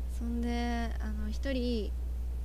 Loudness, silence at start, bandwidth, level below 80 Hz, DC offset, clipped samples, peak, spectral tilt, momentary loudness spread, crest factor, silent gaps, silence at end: -35 LUFS; 0 s; 14 kHz; -34 dBFS; under 0.1%; under 0.1%; -20 dBFS; -6.5 dB/octave; 5 LU; 12 dB; none; 0 s